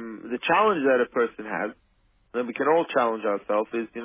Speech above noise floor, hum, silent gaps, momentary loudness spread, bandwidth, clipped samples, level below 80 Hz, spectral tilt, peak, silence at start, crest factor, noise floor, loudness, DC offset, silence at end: 40 dB; none; none; 11 LU; 3.8 kHz; under 0.1%; -68 dBFS; -9 dB/octave; -8 dBFS; 0 s; 16 dB; -64 dBFS; -25 LUFS; under 0.1%; 0 s